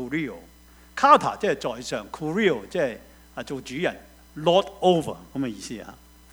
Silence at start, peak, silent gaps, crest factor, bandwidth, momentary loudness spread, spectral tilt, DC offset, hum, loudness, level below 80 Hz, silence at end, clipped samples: 0 s; -2 dBFS; none; 24 dB; over 20 kHz; 22 LU; -5 dB/octave; under 0.1%; none; -24 LUFS; -54 dBFS; 0.4 s; under 0.1%